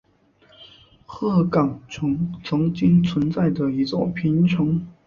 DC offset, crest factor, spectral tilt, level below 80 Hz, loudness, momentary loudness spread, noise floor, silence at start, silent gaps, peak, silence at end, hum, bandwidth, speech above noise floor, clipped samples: under 0.1%; 16 dB; -8.5 dB/octave; -50 dBFS; -21 LUFS; 8 LU; -57 dBFS; 0.6 s; none; -6 dBFS; 0.15 s; none; 7 kHz; 37 dB; under 0.1%